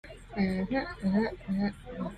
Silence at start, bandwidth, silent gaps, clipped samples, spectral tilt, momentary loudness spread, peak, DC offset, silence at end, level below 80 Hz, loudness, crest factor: 0.05 s; 9.4 kHz; none; under 0.1%; -8 dB/octave; 7 LU; -16 dBFS; under 0.1%; 0 s; -50 dBFS; -32 LUFS; 16 dB